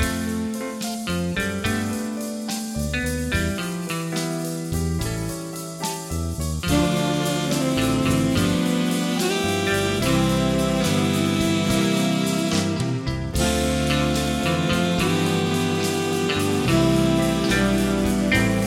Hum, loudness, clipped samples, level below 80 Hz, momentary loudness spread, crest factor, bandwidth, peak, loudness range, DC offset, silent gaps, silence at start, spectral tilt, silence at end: none; -22 LUFS; under 0.1%; -36 dBFS; 8 LU; 16 dB; 16.5 kHz; -6 dBFS; 5 LU; under 0.1%; none; 0 s; -5 dB/octave; 0 s